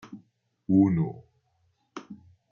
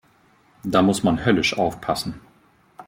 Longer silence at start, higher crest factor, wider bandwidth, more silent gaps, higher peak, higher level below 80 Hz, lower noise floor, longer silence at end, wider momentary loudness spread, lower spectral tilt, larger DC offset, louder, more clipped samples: second, 0.05 s vs 0.65 s; about the same, 20 dB vs 20 dB; second, 6.6 kHz vs 16.5 kHz; neither; second, -10 dBFS vs -4 dBFS; second, -64 dBFS vs -50 dBFS; first, -71 dBFS vs -58 dBFS; first, 0.35 s vs 0.05 s; first, 25 LU vs 14 LU; first, -10 dB/octave vs -5 dB/octave; neither; second, -25 LUFS vs -21 LUFS; neither